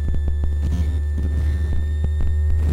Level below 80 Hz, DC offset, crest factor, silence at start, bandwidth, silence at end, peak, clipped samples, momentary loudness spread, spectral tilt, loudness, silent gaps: -20 dBFS; under 0.1%; 8 dB; 0 s; 4.2 kHz; 0 s; -10 dBFS; under 0.1%; 2 LU; -8 dB/octave; -22 LUFS; none